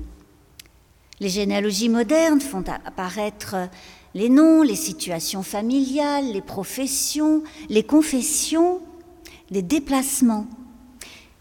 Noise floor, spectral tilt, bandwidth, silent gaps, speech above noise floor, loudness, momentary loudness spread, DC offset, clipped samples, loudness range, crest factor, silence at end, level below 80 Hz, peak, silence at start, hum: -54 dBFS; -4 dB/octave; 18 kHz; none; 33 dB; -21 LUFS; 13 LU; under 0.1%; under 0.1%; 3 LU; 16 dB; 0.2 s; -50 dBFS; -6 dBFS; 0 s; none